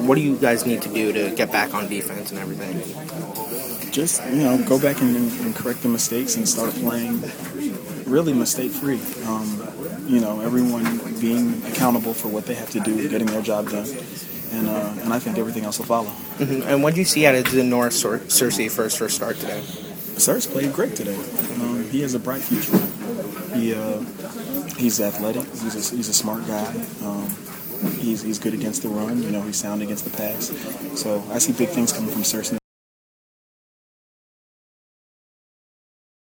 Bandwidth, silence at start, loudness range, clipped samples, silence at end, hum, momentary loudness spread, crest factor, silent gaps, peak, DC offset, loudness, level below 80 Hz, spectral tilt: 19.5 kHz; 0 s; 6 LU; under 0.1%; 3.8 s; none; 11 LU; 22 dB; none; 0 dBFS; under 0.1%; -22 LUFS; -60 dBFS; -4 dB/octave